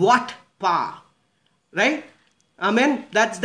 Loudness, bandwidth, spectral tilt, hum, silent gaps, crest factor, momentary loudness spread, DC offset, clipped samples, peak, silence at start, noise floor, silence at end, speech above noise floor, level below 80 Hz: -22 LUFS; 10.5 kHz; -4 dB/octave; none; none; 18 dB; 12 LU; under 0.1%; under 0.1%; -4 dBFS; 0 s; -67 dBFS; 0 s; 47 dB; -74 dBFS